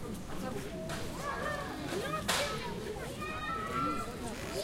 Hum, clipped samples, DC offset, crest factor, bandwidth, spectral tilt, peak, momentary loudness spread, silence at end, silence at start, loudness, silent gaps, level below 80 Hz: none; under 0.1%; under 0.1%; 20 dB; 16 kHz; -4 dB/octave; -16 dBFS; 8 LU; 0 s; 0 s; -37 LUFS; none; -50 dBFS